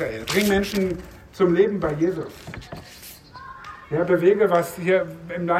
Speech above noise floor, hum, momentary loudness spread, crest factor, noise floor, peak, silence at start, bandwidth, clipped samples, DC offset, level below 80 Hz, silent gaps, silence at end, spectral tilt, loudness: 22 dB; none; 21 LU; 16 dB; -43 dBFS; -6 dBFS; 0 s; 16 kHz; under 0.1%; under 0.1%; -48 dBFS; none; 0 s; -5.5 dB/octave; -21 LUFS